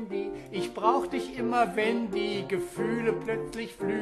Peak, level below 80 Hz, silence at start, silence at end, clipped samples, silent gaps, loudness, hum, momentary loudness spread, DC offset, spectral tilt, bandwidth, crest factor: -8 dBFS; -58 dBFS; 0 s; 0 s; under 0.1%; none; -29 LUFS; none; 8 LU; under 0.1%; -5.5 dB/octave; 13 kHz; 20 dB